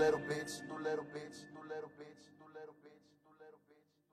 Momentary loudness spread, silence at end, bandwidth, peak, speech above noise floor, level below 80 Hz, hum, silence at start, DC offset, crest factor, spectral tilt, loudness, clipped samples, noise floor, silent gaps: 22 LU; 0.4 s; 14 kHz; -22 dBFS; 28 dB; -76 dBFS; none; 0 s; under 0.1%; 22 dB; -4.5 dB/octave; -43 LUFS; under 0.1%; -72 dBFS; none